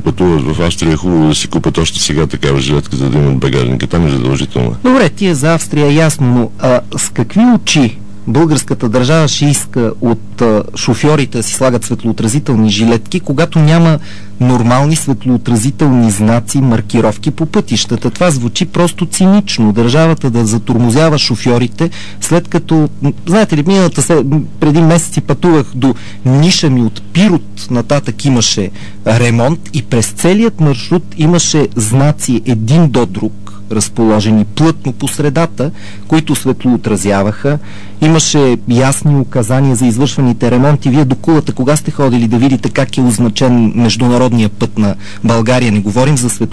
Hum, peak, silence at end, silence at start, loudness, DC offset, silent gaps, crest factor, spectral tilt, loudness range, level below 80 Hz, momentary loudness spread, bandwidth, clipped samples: none; 0 dBFS; 0.05 s; 0 s; -11 LUFS; 9%; none; 10 dB; -5.5 dB/octave; 2 LU; -34 dBFS; 6 LU; 11 kHz; under 0.1%